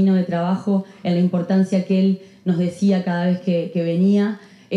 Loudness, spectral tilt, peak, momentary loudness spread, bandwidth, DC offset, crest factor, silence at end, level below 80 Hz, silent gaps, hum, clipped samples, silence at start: -20 LUFS; -8.5 dB/octave; -8 dBFS; 5 LU; 7.6 kHz; under 0.1%; 10 dB; 0 s; -70 dBFS; none; none; under 0.1%; 0 s